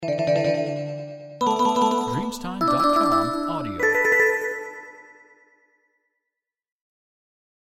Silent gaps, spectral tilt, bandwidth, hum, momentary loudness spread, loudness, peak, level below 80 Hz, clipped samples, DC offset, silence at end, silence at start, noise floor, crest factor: none; -5 dB/octave; 16.5 kHz; none; 15 LU; -22 LUFS; -8 dBFS; -54 dBFS; under 0.1%; under 0.1%; 2.7 s; 0 s; -85 dBFS; 16 dB